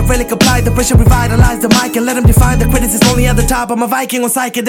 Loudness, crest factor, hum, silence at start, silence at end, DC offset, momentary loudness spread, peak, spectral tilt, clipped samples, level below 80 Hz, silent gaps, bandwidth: -11 LUFS; 10 dB; none; 0 s; 0 s; under 0.1%; 5 LU; 0 dBFS; -5 dB/octave; 0.2%; -16 dBFS; none; 17.5 kHz